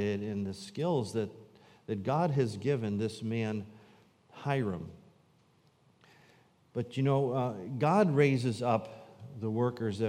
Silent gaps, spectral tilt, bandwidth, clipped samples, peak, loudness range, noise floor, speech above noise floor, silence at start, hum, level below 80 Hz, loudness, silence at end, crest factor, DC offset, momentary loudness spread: none; -7.5 dB/octave; 11.5 kHz; under 0.1%; -14 dBFS; 9 LU; -67 dBFS; 36 dB; 0 s; none; -74 dBFS; -32 LUFS; 0 s; 20 dB; under 0.1%; 14 LU